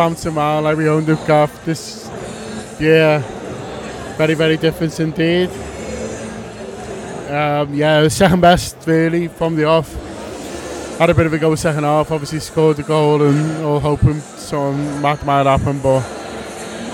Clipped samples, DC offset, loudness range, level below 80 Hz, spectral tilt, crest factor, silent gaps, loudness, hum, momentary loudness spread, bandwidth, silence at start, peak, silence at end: under 0.1%; under 0.1%; 4 LU; -38 dBFS; -6 dB/octave; 16 dB; none; -16 LUFS; none; 15 LU; 17 kHz; 0 s; 0 dBFS; 0 s